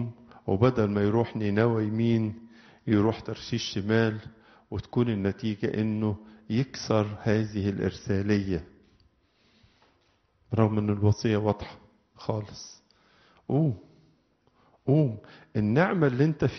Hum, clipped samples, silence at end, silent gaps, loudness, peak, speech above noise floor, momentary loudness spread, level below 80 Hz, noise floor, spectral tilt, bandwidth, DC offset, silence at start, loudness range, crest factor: none; under 0.1%; 0 s; none; -27 LUFS; -8 dBFS; 42 dB; 14 LU; -56 dBFS; -68 dBFS; -7 dB/octave; 6.4 kHz; under 0.1%; 0 s; 4 LU; 20 dB